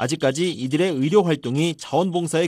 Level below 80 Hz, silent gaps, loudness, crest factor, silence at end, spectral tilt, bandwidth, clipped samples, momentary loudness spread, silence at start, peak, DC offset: -66 dBFS; none; -21 LUFS; 16 dB; 0 s; -5.5 dB/octave; 15.5 kHz; under 0.1%; 5 LU; 0 s; -4 dBFS; under 0.1%